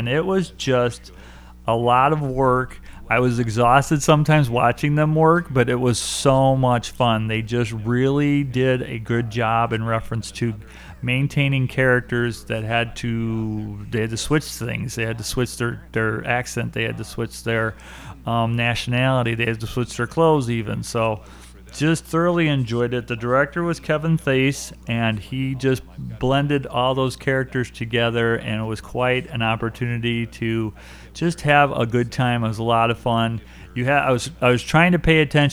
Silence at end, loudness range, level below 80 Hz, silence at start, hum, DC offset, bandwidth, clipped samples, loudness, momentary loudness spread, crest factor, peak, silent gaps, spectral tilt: 0 s; 6 LU; -42 dBFS; 0 s; none; under 0.1%; over 20 kHz; under 0.1%; -21 LUFS; 10 LU; 20 dB; 0 dBFS; none; -5.5 dB/octave